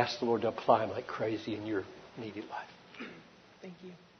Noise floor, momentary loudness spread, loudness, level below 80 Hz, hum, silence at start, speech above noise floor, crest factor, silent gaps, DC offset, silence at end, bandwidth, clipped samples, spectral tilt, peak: -56 dBFS; 21 LU; -34 LUFS; -74 dBFS; none; 0 s; 22 dB; 24 dB; none; under 0.1%; 0.25 s; 6.6 kHz; under 0.1%; -5.5 dB/octave; -12 dBFS